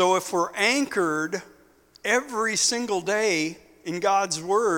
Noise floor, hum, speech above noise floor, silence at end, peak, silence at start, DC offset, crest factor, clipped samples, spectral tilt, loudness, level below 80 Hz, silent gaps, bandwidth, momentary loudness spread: -56 dBFS; none; 32 dB; 0 s; -6 dBFS; 0 s; under 0.1%; 18 dB; under 0.1%; -2.5 dB/octave; -24 LUFS; -66 dBFS; none; 18 kHz; 10 LU